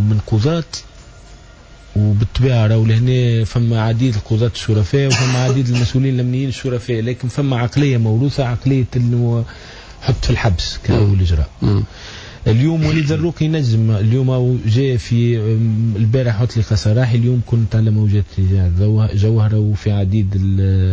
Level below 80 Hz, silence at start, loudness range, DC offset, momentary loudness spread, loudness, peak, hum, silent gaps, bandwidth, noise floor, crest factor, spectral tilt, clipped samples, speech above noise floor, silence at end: -28 dBFS; 0 s; 2 LU; under 0.1%; 5 LU; -16 LUFS; -4 dBFS; none; none; 8 kHz; -40 dBFS; 12 dB; -7 dB/octave; under 0.1%; 26 dB; 0 s